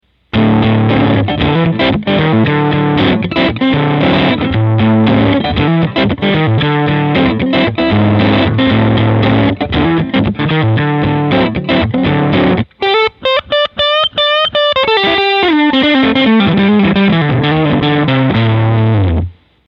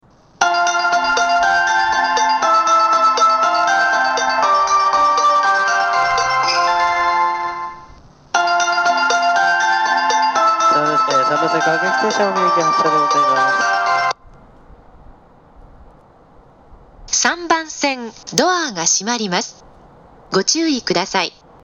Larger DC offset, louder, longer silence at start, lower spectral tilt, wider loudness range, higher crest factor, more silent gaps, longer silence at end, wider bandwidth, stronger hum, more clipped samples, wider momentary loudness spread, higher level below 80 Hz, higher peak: neither; first, -11 LUFS vs -15 LUFS; about the same, 0.35 s vs 0.4 s; first, -8.5 dB/octave vs -1.5 dB/octave; second, 2 LU vs 7 LU; second, 10 dB vs 16 dB; neither; about the same, 0.35 s vs 0.35 s; second, 5.8 kHz vs 15.5 kHz; neither; neither; second, 3 LU vs 6 LU; first, -32 dBFS vs -52 dBFS; about the same, 0 dBFS vs 0 dBFS